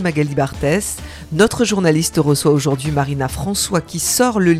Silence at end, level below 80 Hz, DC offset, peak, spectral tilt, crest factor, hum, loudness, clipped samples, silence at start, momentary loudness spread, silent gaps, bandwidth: 0 s; -38 dBFS; under 0.1%; 0 dBFS; -4.5 dB/octave; 16 dB; none; -17 LUFS; under 0.1%; 0 s; 6 LU; none; 16 kHz